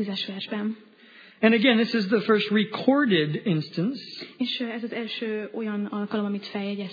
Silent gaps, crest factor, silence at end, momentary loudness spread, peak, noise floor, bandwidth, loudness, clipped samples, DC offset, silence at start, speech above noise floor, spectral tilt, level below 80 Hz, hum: none; 20 dB; 0 s; 11 LU; -4 dBFS; -51 dBFS; 5 kHz; -25 LUFS; under 0.1%; under 0.1%; 0 s; 26 dB; -7.5 dB/octave; -80 dBFS; none